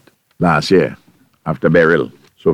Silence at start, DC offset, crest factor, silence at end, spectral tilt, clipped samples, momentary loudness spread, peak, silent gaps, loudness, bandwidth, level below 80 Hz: 0.4 s; under 0.1%; 16 dB; 0 s; -6.5 dB/octave; under 0.1%; 13 LU; 0 dBFS; none; -15 LUFS; 12.5 kHz; -46 dBFS